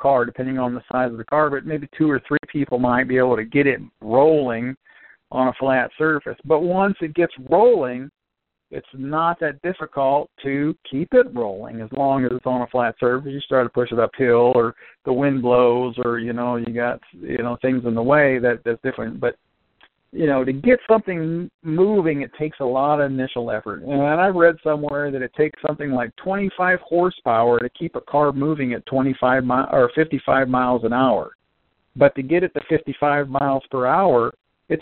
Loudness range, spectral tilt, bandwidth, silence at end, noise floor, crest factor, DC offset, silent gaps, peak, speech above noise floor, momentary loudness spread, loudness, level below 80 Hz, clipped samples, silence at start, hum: 2 LU; -5.5 dB/octave; 4.3 kHz; 0 s; -80 dBFS; 20 dB; under 0.1%; 4.77-4.81 s, 21.54-21.59 s, 31.35-31.39 s; 0 dBFS; 61 dB; 10 LU; -20 LUFS; -54 dBFS; under 0.1%; 0 s; none